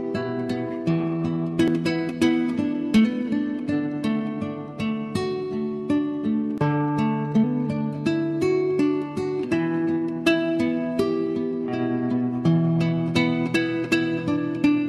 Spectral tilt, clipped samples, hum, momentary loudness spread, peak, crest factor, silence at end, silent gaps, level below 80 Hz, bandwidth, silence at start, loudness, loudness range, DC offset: -7 dB/octave; under 0.1%; none; 6 LU; -8 dBFS; 14 dB; 0 s; none; -56 dBFS; 12.5 kHz; 0 s; -24 LUFS; 2 LU; under 0.1%